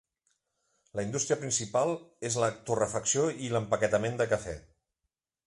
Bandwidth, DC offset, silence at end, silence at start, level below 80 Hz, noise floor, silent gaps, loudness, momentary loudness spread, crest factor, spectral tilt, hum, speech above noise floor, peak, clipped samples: 11.5 kHz; under 0.1%; 0.85 s; 0.95 s; -60 dBFS; -86 dBFS; none; -30 LUFS; 9 LU; 18 dB; -4 dB/octave; none; 56 dB; -12 dBFS; under 0.1%